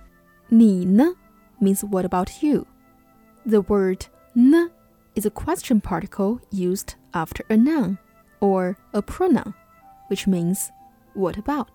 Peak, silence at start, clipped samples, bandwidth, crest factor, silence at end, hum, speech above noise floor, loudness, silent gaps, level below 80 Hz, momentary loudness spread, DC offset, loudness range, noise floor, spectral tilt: -6 dBFS; 0.5 s; under 0.1%; 18.5 kHz; 16 dB; 0.1 s; none; 35 dB; -22 LUFS; none; -46 dBFS; 13 LU; under 0.1%; 3 LU; -55 dBFS; -6.5 dB/octave